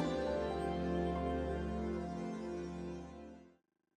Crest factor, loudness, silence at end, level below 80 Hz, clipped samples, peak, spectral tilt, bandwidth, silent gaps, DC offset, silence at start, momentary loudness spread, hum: 14 dB; -40 LUFS; 0.5 s; -52 dBFS; under 0.1%; -24 dBFS; -7.5 dB/octave; 10 kHz; none; under 0.1%; 0 s; 14 LU; none